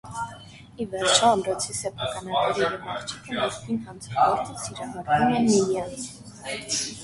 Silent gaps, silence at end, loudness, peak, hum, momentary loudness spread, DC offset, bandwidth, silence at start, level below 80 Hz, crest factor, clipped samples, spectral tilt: none; 0 s; -25 LUFS; -4 dBFS; none; 15 LU; under 0.1%; 11.5 kHz; 0.05 s; -56 dBFS; 22 dB; under 0.1%; -3 dB/octave